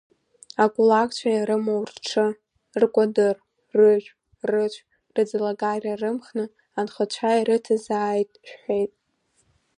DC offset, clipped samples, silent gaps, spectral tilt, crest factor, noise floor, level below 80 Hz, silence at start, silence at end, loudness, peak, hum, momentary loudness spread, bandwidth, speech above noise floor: under 0.1%; under 0.1%; none; -5 dB/octave; 18 dB; -69 dBFS; -72 dBFS; 0.6 s; 0.9 s; -23 LUFS; -6 dBFS; none; 13 LU; 10.5 kHz; 47 dB